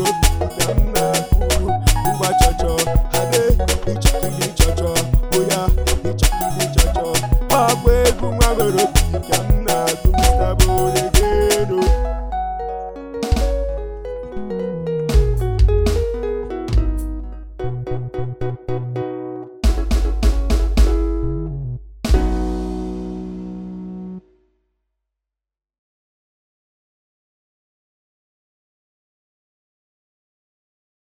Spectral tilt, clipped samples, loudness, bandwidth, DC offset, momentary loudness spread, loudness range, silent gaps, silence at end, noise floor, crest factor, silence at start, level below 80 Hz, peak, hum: -4.5 dB/octave; under 0.1%; -19 LUFS; over 20 kHz; 1%; 13 LU; 8 LU; none; 5.35 s; -87 dBFS; 18 dB; 0 s; -20 dBFS; 0 dBFS; none